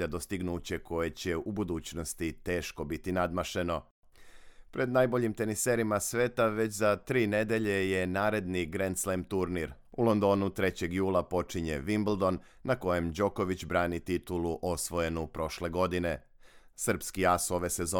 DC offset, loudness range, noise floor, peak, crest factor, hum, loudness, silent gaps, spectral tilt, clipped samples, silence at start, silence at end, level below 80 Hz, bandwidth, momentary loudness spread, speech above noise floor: under 0.1%; 5 LU; -51 dBFS; -12 dBFS; 18 dB; none; -31 LUFS; 3.91-4.03 s; -5 dB/octave; under 0.1%; 0 s; 0 s; -54 dBFS; 18 kHz; 7 LU; 20 dB